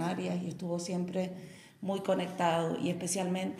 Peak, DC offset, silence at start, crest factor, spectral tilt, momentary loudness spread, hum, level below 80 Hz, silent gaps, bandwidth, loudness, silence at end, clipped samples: -14 dBFS; under 0.1%; 0 s; 18 dB; -5 dB/octave; 9 LU; none; -74 dBFS; none; 15 kHz; -34 LUFS; 0 s; under 0.1%